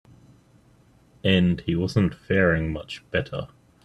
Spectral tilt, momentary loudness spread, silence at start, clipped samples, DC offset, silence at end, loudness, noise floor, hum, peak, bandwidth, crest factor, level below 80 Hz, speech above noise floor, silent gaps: -7 dB/octave; 13 LU; 1.25 s; under 0.1%; under 0.1%; 0.4 s; -24 LUFS; -57 dBFS; none; -6 dBFS; 11 kHz; 20 dB; -48 dBFS; 34 dB; none